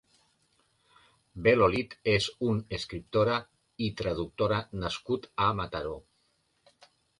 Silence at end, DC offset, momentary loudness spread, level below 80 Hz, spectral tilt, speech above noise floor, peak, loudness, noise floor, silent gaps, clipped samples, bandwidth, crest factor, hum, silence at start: 1.2 s; under 0.1%; 11 LU; -52 dBFS; -6 dB/octave; 44 dB; -8 dBFS; -29 LUFS; -73 dBFS; none; under 0.1%; 11.5 kHz; 22 dB; none; 1.35 s